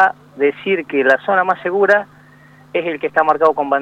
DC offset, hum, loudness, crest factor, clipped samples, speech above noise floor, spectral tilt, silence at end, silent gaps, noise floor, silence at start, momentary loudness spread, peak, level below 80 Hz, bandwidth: under 0.1%; none; -16 LUFS; 14 dB; under 0.1%; 30 dB; -6 dB/octave; 0 s; none; -45 dBFS; 0 s; 8 LU; -2 dBFS; -64 dBFS; 8.4 kHz